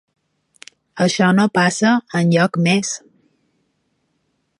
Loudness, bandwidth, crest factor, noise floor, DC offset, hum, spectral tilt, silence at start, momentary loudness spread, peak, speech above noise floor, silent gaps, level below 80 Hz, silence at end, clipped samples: -16 LUFS; 11.5 kHz; 18 dB; -68 dBFS; under 0.1%; none; -5 dB/octave; 0.95 s; 10 LU; -2 dBFS; 53 dB; none; -64 dBFS; 1.65 s; under 0.1%